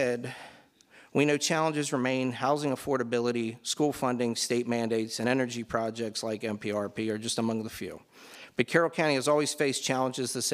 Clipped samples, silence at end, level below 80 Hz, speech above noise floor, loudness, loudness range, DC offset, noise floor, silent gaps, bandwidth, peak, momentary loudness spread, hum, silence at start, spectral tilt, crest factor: under 0.1%; 0 s; -68 dBFS; 29 dB; -29 LUFS; 3 LU; under 0.1%; -58 dBFS; none; 16 kHz; -8 dBFS; 9 LU; none; 0 s; -4 dB/octave; 20 dB